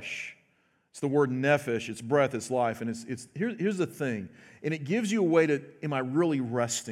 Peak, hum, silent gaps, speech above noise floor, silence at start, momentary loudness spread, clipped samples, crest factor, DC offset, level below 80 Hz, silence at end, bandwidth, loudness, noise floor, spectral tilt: -10 dBFS; none; none; 41 dB; 0 s; 12 LU; under 0.1%; 18 dB; under 0.1%; -76 dBFS; 0 s; 15.5 kHz; -29 LUFS; -70 dBFS; -5.5 dB/octave